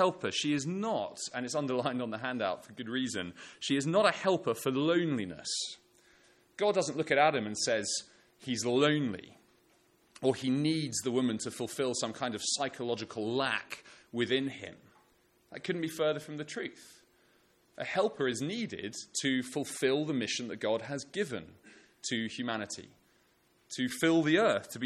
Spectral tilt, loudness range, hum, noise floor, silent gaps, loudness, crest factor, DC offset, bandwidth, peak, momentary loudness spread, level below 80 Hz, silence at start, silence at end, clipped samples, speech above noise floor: -4 dB/octave; 5 LU; none; -69 dBFS; none; -32 LUFS; 22 dB; under 0.1%; 14.5 kHz; -12 dBFS; 13 LU; -74 dBFS; 0 s; 0 s; under 0.1%; 37 dB